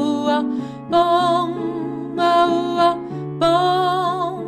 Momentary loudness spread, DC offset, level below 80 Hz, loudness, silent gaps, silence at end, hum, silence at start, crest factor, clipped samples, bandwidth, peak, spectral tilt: 10 LU; under 0.1%; -58 dBFS; -19 LUFS; none; 0 s; none; 0 s; 14 dB; under 0.1%; 12 kHz; -4 dBFS; -6 dB/octave